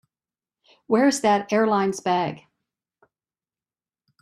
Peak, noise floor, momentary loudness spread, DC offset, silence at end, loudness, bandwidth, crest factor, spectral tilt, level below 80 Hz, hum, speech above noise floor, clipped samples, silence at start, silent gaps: -6 dBFS; under -90 dBFS; 8 LU; under 0.1%; 1.85 s; -22 LUFS; 13 kHz; 18 dB; -4.5 dB/octave; -70 dBFS; none; over 69 dB; under 0.1%; 0.9 s; none